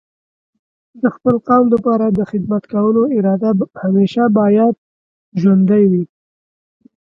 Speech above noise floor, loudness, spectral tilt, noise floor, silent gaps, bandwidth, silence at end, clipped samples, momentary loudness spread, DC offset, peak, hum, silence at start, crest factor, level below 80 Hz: over 77 dB; -14 LUFS; -10 dB/octave; under -90 dBFS; 4.78-5.32 s; 5.8 kHz; 1.05 s; under 0.1%; 8 LU; under 0.1%; 0 dBFS; none; 0.95 s; 14 dB; -54 dBFS